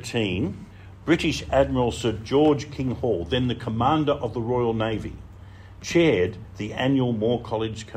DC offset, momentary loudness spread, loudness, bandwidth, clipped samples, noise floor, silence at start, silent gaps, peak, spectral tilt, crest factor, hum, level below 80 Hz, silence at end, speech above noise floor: under 0.1%; 12 LU; -24 LUFS; 14.5 kHz; under 0.1%; -43 dBFS; 0 s; none; -6 dBFS; -6 dB/octave; 18 dB; none; -44 dBFS; 0 s; 20 dB